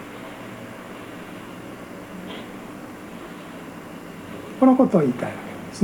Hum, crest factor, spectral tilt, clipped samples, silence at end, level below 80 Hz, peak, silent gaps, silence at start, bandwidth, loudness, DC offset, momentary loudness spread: none; 22 dB; -7 dB/octave; under 0.1%; 0 s; -60 dBFS; -4 dBFS; none; 0 s; 19 kHz; -21 LUFS; under 0.1%; 20 LU